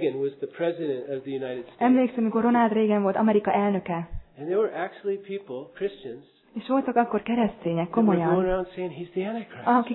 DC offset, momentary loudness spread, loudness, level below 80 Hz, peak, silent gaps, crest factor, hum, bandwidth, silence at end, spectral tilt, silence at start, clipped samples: under 0.1%; 13 LU; -25 LUFS; -50 dBFS; -8 dBFS; none; 16 dB; none; 4.1 kHz; 0 s; -11 dB/octave; 0 s; under 0.1%